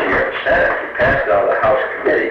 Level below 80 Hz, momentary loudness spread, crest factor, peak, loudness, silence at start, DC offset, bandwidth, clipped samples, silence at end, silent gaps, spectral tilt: -38 dBFS; 3 LU; 12 dB; -4 dBFS; -15 LUFS; 0 s; under 0.1%; 6.6 kHz; under 0.1%; 0 s; none; -7 dB/octave